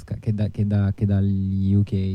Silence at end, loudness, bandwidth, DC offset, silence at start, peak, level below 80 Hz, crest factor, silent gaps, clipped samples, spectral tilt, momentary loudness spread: 0 s; -22 LUFS; 5.2 kHz; under 0.1%; 0 s; -10 dBFS; -46 dBFS; 10 dB; none; under 0.1%; -10.5 dB/octave; 4 LU